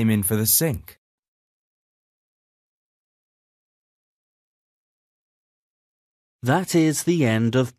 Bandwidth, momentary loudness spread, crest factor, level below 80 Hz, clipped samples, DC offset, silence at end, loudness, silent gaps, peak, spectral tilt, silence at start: 14 kHz; 9 LU; 20 dB; -58 dBFS; under 0.1%; under 0.1%; 0.1 s; -20 LUFS; 0.98-6.39 s; -6 dBFS; -5 dB/octave; 0 s